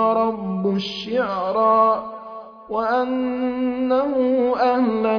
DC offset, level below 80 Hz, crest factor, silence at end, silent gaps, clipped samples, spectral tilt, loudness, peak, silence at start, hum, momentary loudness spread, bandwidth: under 0.1%; -58 dBFS; 14 dB; 0 s; none; under 0.1%; -7.5 dB/octave; -20 LUFS; -6 dBFS; 0 s; none; 9 LU; 5.4 kHz